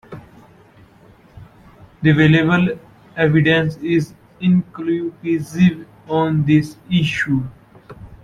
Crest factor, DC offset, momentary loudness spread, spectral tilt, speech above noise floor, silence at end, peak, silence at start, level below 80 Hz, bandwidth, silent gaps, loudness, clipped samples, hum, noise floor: 16 dB; under 0.1%; 17 LU; -7.5 dB/octave; 32 dB; 0.1 s; -2 dBFS; 0.1 s; -48 dBFS; 11 kHz; none; -17 LUFS; under 0.1%; none; -48 dBFS